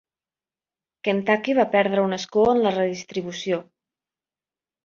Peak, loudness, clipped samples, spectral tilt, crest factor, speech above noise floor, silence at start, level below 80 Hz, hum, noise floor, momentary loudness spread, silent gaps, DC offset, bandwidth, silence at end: -4 dBFS; -22 LUFS; under 0.1%; -5.5 dB/octave; 20 dB; over 69 dB; 1.05 s; -62 dBFS; none; under -90 dBFS; 10 LU; none; under 0.1%; 7.4 kHz; 1.25 s